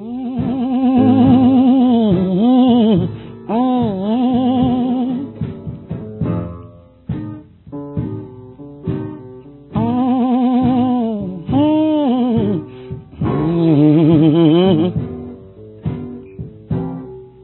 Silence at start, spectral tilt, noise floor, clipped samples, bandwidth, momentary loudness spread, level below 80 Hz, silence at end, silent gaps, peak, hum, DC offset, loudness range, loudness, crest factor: 0 s; -13.5 dB/octave; -39 dBFS; under 0.1%; 4.2 kHz; 20 LU; -40 dBFS; 0.15 s; none; -2 dBFS; none; under 0.1%; 13 LU; -15 LUFS; 14 dB